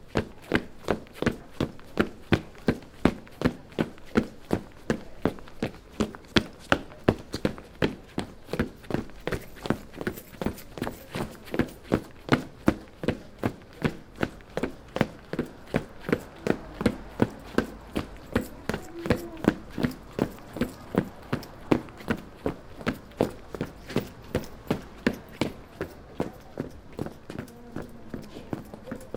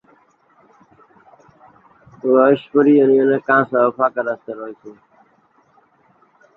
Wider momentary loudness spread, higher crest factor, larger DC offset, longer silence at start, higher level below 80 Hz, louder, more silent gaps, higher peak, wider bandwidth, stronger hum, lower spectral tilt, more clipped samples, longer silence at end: second, 10 LU vs 16 LU; first, 30 dB vs 18 dB; neither; second, 0 s vs 2.25 s; first, -46 dBFS vs -66 dBFS; second, -32 LUFS vs -16 LUFS; neither; about the same, 0 dBFS vs -2 dBFS; first, 18 kHz vs 4.1 kHz; neither; second, -6 dB/octave vs -9 dB/octave; neither; second, 0 s vs 1.65 s